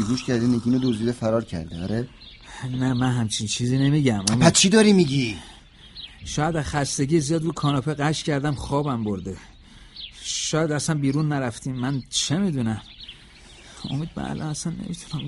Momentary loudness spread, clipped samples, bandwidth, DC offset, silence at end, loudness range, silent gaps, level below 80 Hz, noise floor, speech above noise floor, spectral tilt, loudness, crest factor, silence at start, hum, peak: 19 LU; under 0.1%; 11.5 kHz; under 0.1%; 0 s; 7 LU; none; -46 dBFS; -47 dBFS; 24 dB; -5 dB/octave; -23 LUFS; 22 dB; 0 s; none; -2 dBFS